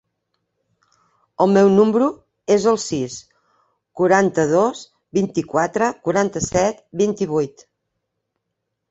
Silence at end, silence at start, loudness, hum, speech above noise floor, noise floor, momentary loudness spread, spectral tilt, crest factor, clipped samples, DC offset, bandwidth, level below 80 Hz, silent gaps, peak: 1.4 s; 1.4 s; -19 LUFS; none; 60 dB; -78 dBFS; 11 LU; -5.5 dB/octave; 18 dB; under 0.1%; under 0.1%; 8.2 kHz; -54 dBFS; none; -2 dBFS